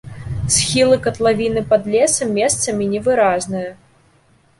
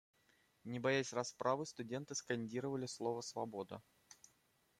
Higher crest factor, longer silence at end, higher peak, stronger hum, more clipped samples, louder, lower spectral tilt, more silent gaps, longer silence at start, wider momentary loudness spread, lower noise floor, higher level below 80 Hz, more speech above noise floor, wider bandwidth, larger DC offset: second, 16 dB vs 22 dB; first, 0.85 s vs 0.65 s; first, -2 dBFS vs -22 dBFS; neither; neither; first, -16 LUFS vs -42 LUFS; about the same, -3.5 dB/octave vs -4.5 dB/octave; neither; second, 0.05 s vs 0.65 s; second, 11 LU vs 18 LU; second, -55 dBFS vs -77 dBFS; first, -42 dBFS vs -82 dBFS; about the same, 38 dB vs 35 dB; second, 11.5 kHz vs 15.5 kHz; neither